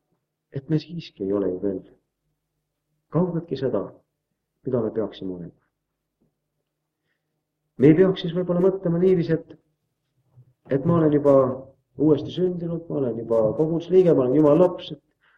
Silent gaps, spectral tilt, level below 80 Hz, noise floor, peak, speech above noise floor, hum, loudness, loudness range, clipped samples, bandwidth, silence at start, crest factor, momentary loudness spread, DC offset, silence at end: none; -9.5 dB/octave; -60 dBFS; -80 dBFS; -4 dBFS; 59 dB; none; -22 LUFS; 10 LU; under 0.1%; 6.4 kHz; 0.55 s; 20 dB; 18 LU; under 0.1%; 0.45 s